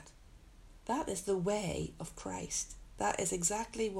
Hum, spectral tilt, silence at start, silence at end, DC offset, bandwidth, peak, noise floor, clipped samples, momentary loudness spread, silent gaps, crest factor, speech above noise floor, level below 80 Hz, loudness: none; -3.5 dB/octave; 0 s; 0 s; under 0.1%; 16 kHz; -18 dBFS; -57 dBFS; under 0.1%; 10 LU; none; 20 dB; 21 dB; -56 dBFS; -36 LUFS